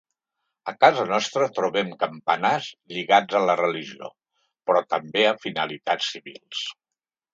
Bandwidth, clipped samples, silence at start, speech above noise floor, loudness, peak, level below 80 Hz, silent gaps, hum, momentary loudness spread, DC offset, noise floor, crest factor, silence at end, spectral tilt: 7.8 kHz; under 0.1%; 0.65 s; 65 dB; -23 LUFS; -2 dBFS; -76 dBFS; none; none; 15 LU; under 0.1%; -88 dBFS; 24 dB; 0.6 s; -3.5 dB/octave